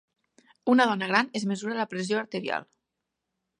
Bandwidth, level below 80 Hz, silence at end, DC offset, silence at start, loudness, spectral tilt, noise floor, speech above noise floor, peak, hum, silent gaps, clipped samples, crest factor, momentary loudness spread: 10.5 kHz; -80 dBFS; 0.95 s; under 0.1%; 0.65 s; -27 LUFS; -5 dB/octave; -84 dBFS; 58 dB; -6 dBFS; none; none; under 0.1%; 22 dB; 10 LU